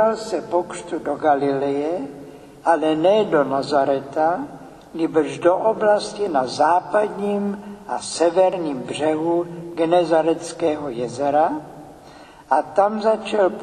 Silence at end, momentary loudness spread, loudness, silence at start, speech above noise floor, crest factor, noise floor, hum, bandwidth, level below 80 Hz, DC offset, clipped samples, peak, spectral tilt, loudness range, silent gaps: 0 s; 11 LU; -20 LUFS; 0 s; 24 dB; 16 dB; -44 dBFS; none; 11.5 kHz; -58 dBFS; under 0.1%; under 0.1%; -4 dBFS; -5 dB/octave; 2 LU; none